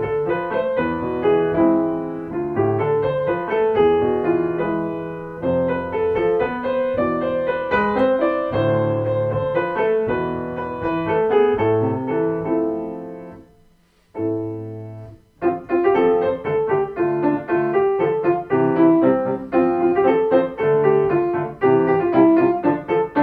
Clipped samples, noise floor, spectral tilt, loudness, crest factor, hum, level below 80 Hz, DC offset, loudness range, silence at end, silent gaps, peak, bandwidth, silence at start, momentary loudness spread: under 0.1%; -56 dBFS; -9.5 dB/octave; -19 LUFS; 16 dB; none; -50 dBFS; under 0.1%; 5 LU; 0 s; none; -4 dBFS; 4.6 kHz; 0 s; 10 LU